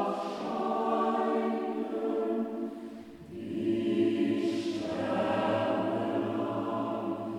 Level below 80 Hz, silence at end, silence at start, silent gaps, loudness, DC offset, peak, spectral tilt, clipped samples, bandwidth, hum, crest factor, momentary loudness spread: -70 dBFS; 0 s; 0 s; none; -31 LUFS; under 0.1%; -16 dBFS; -7 dB/octave; under 0.1%; 11 kHz; none; 16 dB; 10 LU